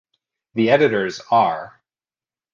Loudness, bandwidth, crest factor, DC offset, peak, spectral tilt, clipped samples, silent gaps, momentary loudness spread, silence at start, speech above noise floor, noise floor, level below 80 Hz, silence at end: -18 LUFS; 7.4 kHz; 20 dB; under 0.1%; -2 dBFS; -6 dB/octave; under 0.1%; none; 12 LU; 0.55 s; over 72 dB; under -90 dBFS; -64 dBFS; 0.85 s